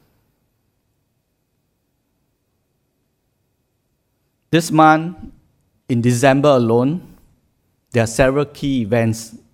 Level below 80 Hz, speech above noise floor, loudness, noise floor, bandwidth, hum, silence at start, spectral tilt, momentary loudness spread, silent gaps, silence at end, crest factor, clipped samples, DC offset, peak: -44 dBFS; 53 dB; -16 LUFS; -68 dBFS; 16.5 kHz; none; 4.5 s; -6 dB/octave; 11 LU; none; 0.15 s; 20 dB; under 0.1%; under 0.1%; 0 dBFS